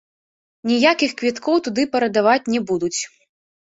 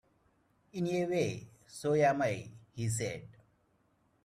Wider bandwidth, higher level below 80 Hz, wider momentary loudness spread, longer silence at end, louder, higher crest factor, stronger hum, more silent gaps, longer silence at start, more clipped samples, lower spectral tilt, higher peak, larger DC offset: second, 8 kHz vs 14.5 kHz; about the same, -64 dBFS vs -68 dBFS; second, 9 LU vs 18 LU; second, 0.65 s vs 0.95 s; first, -19 LUFS vs -33 LUFS; about the same, 20 dB vs 20 dB; neither; neither; about the same, 0.65 s vs 0.75 s; neither; second, -3.5 dB/octave vs -5.5 dB/octave; first, -2 dBFS vs -16 dBFS; neither